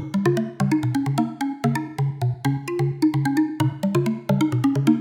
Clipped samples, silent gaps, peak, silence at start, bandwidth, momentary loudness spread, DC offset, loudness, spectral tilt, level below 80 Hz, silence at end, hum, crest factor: under 0.1%; none; -6 dBFS; 0 s; 16.5 kHz; 5 LU; under 0.1%; -23 LUFS; -7.5 dB/octave; -58 dBFS; 0 s; none; 16 dB